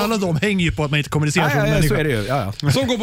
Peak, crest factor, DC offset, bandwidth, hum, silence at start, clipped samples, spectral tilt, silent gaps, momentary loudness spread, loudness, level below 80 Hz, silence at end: -6 dBFS; 12 dB; under 0.1%; 16 kHz; none; 0 s; under 0.1%; -5.5 dB/octave; none; 4 LU; -19 LUFS; -34 dBFS; 0 s